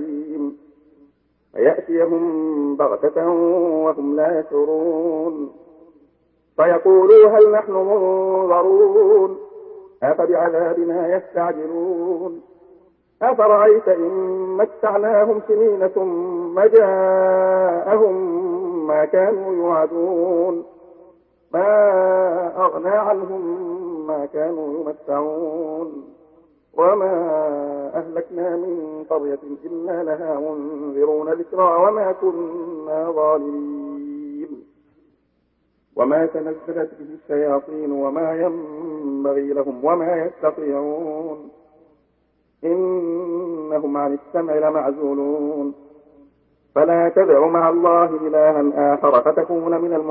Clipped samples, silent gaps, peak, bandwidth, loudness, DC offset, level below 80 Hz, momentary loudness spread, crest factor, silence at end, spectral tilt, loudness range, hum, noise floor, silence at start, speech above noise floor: under 0.1%; none; 0 dBFS; 3.3 kHz; -18 LUFS; under 0.1%; -68 dBFS; 14 LU; 18 dB; 0 s; -12 dB/octave; 10 LU; none; -65 dBFS; 0 s; 48 dB